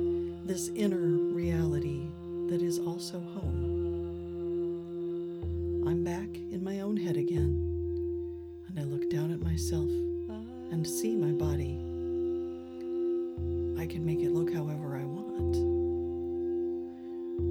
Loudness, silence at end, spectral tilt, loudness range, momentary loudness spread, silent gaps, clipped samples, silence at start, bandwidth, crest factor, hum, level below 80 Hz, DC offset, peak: -33 LUFS; 0 s; -7 dB/octave; 2 LU; 8 LU; none; under 0.1%; 0 s; 17 kHz; 16 dB; none; -46 dBFS; under 0.1%; -16 dBFS